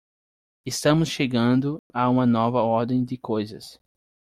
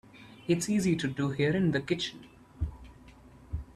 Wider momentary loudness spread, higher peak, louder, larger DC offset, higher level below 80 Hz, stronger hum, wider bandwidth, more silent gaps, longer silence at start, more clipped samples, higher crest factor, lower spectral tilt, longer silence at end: second, 10 LU vs 15 LU; first, -6 dBFS vs -14 dBFS; first, -23 LUFS vs -30 LUFS; neither; second, -56 dBFS vs -48 dBFS; neither; first, 14.5 kHz vs 13 kHz; first, 1.79-1.90 s vs none; first, 0.65 s vs 0.15 s; neither; about the same, 18 dB vs 18 dB; about the same, -6 dB/octave vs -5.5 dB/octave; first, 0.65 s vs 0.05 s